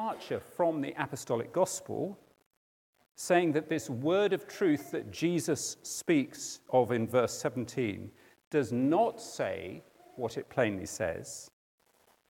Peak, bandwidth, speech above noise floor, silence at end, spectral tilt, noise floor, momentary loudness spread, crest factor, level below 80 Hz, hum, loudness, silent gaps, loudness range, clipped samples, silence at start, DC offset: -12 dBFS; 17.5 kHz; 37 dB; 0.8 s; -5 dB/octave; -68 dBFS; 12 LU; 20 dB; -74 dBFS; none; -32 LUFS; 2.46-2.51 s, 2.57-2.93 s, 3.11-3.15 s, 8.47-8.51 s; 3 LU; under 0.1%; 0 s; under 0.1%